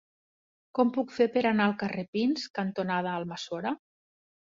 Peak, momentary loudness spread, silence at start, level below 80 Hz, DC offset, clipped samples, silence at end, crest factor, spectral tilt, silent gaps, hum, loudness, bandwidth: -12 dBFS; 10 LU; 0.75 s; -72 dBFS; under 0.1%; under 0.1%; 0.85 s; 18 dB; -6 dB/octave; 2.08-2.13 s, 2.50-2.54 s; none; -29 LUFS; 7.6 kHz